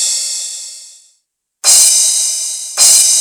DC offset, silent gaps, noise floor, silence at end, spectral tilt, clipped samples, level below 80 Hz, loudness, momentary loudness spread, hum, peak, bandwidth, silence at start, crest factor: under 0.1%; none; -64 dBFS; 0 s; 4.5 dB/octave; 0.3%; -62 dBFS; -8 LUFS; 16 LU; none; 0 dBFS; over 20 kHz; 0 s; 12 dB